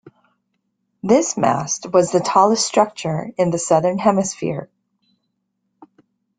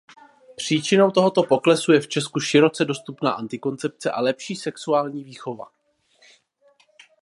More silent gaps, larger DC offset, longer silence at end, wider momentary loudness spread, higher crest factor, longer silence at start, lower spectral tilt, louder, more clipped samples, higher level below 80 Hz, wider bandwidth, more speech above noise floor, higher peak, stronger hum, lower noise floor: neither; neither; first, 1.75 s vs 1.6 s; second, 10 LU vs 14 LU; about the same, 18 dB vs 20 dB; first, 1.05 s vs 0.6 s; about the same, -4.5 dB/octave vs -5 dB/octave; first, -18 LUFS vs -21 LUFS; neither; first, -60 dBFS vs -72 dBFS; second, 9.6 kHz vs 11.5 kHz; first, 55 dB vs 39 dB; about the same, -2 dBFS vs -4 dBFS; neither; first, -73 dBFS vs -60 dBFS